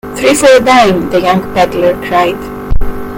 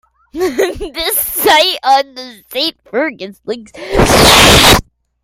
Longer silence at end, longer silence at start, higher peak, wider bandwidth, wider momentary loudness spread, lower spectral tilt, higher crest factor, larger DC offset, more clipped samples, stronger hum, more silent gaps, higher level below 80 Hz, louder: second, 0 s vs 0.45 s; second, 0.05 s vs 0.35 s; about the same, 0 dBFS vs 0 dBFS; second, 17.5 kHz vs over 20 kHz; second, 14 LU vs 20 LU; first, -4.5 dB/octave vs -2.5 dB/octave; about the same, 8 dB vs 12 dB; neither; first, 1% vs 0.2%; neither; neither; about the same, -22 dBFS vs -26 dBFS; about the same, -9 LUFS vs -10 LUFS